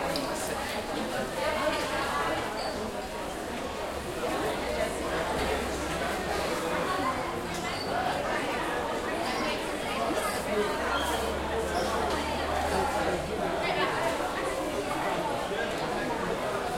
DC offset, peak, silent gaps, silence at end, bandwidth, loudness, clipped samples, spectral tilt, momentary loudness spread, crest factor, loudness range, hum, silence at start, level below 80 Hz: under 0.1%; -14 dBFS; none; 0 s; 16.5 kHz; -30 LUFS; under 0.1%; -4 dB/octave; 4 LU; 16 dB; 2 LU; none; 0 s; -46 dBFS